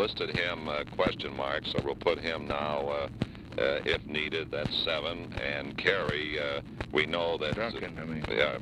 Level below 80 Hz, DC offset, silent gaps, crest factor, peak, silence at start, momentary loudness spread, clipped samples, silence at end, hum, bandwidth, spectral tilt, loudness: -50 dBFS; under 0.1%; none; 22 dB; -10 dBFS; 0 s; 6 LU; under 0.1%; 0 s; none; 12 kHz; -5.5 dB/octave; -31 LUFS